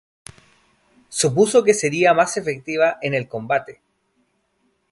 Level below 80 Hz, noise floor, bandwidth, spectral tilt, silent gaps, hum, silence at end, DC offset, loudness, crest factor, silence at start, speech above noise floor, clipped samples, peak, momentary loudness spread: -62 dBFS; -67 dBFS; 11.5 kHz; -4 dB/octave; none; none; 1.2 s; under 0.1%; -19 LUFS; 18 dB; 1.1 s; 49 dB; under 0.1%; -2 dBFS; 10 LU